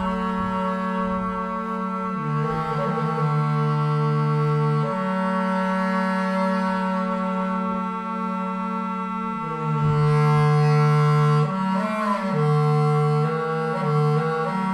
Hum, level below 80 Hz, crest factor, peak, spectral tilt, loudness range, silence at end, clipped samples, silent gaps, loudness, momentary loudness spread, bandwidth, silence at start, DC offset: none; -52 dBFS; 12 dB; -10 dBFS; -8.5 dB/octave; 5 LU; 0 s; under 0.1%; none; -22 LUFS; 8 LU; 9.6 kHz; 0 s; under 0.1%